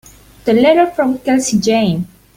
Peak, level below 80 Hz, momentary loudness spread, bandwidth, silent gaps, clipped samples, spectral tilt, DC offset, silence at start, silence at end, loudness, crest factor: -2 dBFS; -48 dBFS; 8 LU; 16.5 kHz; none; under 0.1%; -5 dB/octave; under 0.1%; 0.45 s; 0.3 s; -14 LUFS; 12 dB